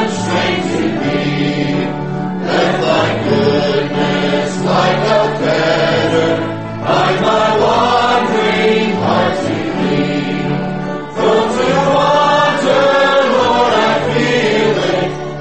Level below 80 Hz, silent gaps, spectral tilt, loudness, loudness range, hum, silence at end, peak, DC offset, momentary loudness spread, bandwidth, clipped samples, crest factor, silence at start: -44 dBFS; none; -5.5 dB/octave; -13 LUFS; 3 LU; none; 0 s; 0 dBFS; 1%; 6 LU; 8.8 kHz; under 0.1%; 12 dB; 0 s